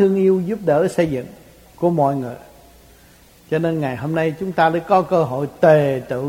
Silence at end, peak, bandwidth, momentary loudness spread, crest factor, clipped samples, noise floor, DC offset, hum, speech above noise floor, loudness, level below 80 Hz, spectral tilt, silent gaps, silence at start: 0 s; 0 dBFS; 16.5 kHz; 10 LU; 18 dB; under 0.1%; -48 dBFS; under 0.1%; none; 31 dB; -18 LUFS; -52 dBFS; -7.5 dB/octave; none; 0 s